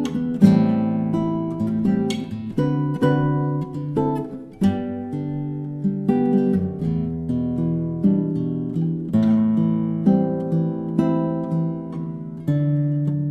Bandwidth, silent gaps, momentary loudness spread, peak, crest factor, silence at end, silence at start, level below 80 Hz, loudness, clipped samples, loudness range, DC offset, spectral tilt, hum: 10 kHz; none; 9 LU; -2 dBFS; 20 dB; 0 s; 0 s; -50 dBFS; -22 LUFS; under 0.1%; 2 LU; under 0.1%; -9 dB/octave; none